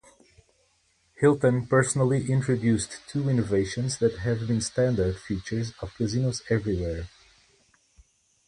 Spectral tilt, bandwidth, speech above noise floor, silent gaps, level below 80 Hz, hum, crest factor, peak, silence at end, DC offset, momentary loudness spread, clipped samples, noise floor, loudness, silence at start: -6 dB/octave; 11.5 kHz; 42 dB; none; -46 dBFS; none; 18 dB; -8 dBFS; 1.4 s; under 0.1%; 10 LU; under 0.1%; -67 dBFS; -26 LUFS; 1.2 s